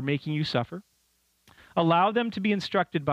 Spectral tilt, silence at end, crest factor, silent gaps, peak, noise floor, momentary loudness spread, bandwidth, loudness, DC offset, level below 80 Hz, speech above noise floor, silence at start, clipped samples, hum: -7 dB/octave; 0 s; 16 dB; none; -10 dBFS; -70 dBFS; 10 LU; 10.5 kHz; -26 LUFS; under 0.1%; -66 dBFS; 44 dB; 0 s; under 0.1%; none